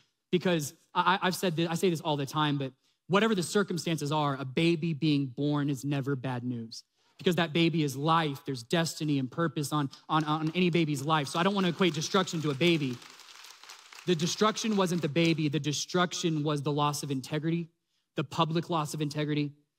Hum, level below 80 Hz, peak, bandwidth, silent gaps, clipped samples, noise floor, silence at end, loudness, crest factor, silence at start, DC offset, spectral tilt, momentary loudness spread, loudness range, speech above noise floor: none; -72 dBFS; -12 dBFS; 16 kHz; none; under 0.1%; -51 dBFS; 0.25 s; -29 LUFS; 18 dB; 0.3 s; under 0.1%; -5 dB/octave; 9 LU; 2 LU; 22 dB